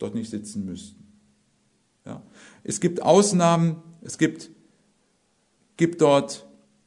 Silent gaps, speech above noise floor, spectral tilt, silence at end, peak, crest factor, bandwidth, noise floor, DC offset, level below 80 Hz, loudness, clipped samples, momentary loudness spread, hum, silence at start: none; 45 dB; -5.5 dB/octave; 0.45 s; -4 dBFS; 22 dB; 11 kHz; -67 dBFS; under 0.1%; -68 dBFS; -22 LUFS; under 0.1%; 23 LU; none; 0 s